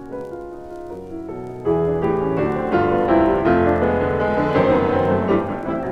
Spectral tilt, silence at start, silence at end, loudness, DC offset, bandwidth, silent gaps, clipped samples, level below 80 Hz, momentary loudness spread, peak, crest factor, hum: -9 dB/octave; 0 s; 0 s; -19 LUFS; under 0.1%; 7.4 kHz; none; under 0.1%; -40 dBFS; 16 LU; -4 dBFS; 14 dB; none